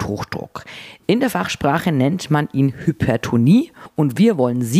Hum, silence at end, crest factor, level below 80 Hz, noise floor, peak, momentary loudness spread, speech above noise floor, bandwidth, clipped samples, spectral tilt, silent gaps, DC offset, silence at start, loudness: none; 0 s; 14 dB; -48 dBFS; -38 dBFS; -4 dBFS; 13 LU; 21 dB; 15.5 kHz; under 0.1%; -6.5 dB/octave; none; under 0.1%; 0 s; -18 LUFS